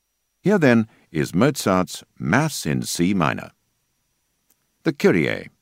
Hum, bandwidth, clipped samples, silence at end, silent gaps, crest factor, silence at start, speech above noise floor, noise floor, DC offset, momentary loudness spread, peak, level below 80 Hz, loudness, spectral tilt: none; 16 kHz; under 0.1%; 0.15 s; none; 22 dB; 0.45 s; 50 dB; -70 dBFS; under 0.1%; 10 LU; 0 dBFS; -54 dBFS; -21 LUFS; -5.5 dB/octave